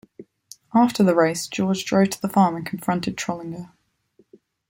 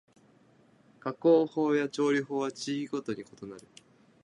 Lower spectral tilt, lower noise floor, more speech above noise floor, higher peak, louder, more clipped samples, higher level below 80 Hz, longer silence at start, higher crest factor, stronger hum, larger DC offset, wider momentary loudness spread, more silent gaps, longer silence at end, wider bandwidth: about the same, -5.5 dB/octave vs -5.5 dB/octave; about the same, -61 dBFS vs -62 dBFS; first, 40 dB vs 33 dB; first, -4 dBFS vs -14 dBFS; first, -21 LUFS vs -29 LUFS; neither; first, -60 dBFS vs -78 dBFS; second, 0.2 s vs 1.05 s; about the same, 18 dB vs 18 dB; neither; neither; second, 11 LU vs 21 LU; neither; first, 1.05 s vs 0.65 s; first, 16.5 kHz vs 11 kHz